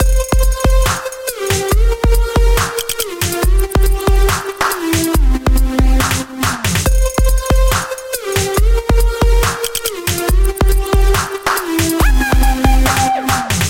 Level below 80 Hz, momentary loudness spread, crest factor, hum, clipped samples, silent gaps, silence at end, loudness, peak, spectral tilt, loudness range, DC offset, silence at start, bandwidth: -14 dBFS; 4 LU; 12 dB; none; under 0.1%; none; 0 s; -15 LUFS; 0 dBFS; -4.5 dB/octave; 1 LU; under 0.1%; 0 s; 17.5 kHz